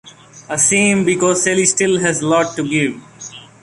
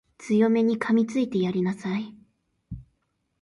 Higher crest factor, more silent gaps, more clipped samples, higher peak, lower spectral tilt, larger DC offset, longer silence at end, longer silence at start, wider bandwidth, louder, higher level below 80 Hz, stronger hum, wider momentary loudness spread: about the same, 16 dB vs 16 dB; neither; neither; first, 0 dBFS vs -10 dBFS; second, -3.5 dB/octave vs -7 dB/octave; neither; second, 0.2 s vs 0.6 s; second, 0.05 s vs 0.2 s; about the same, 11.5 kHz vs 11 kHz; first, -14 LUFS vs -24 LUFS; about the same, -54 dBFS vs -56 dBFS; neither; about the same, 19 LU vs 21 LU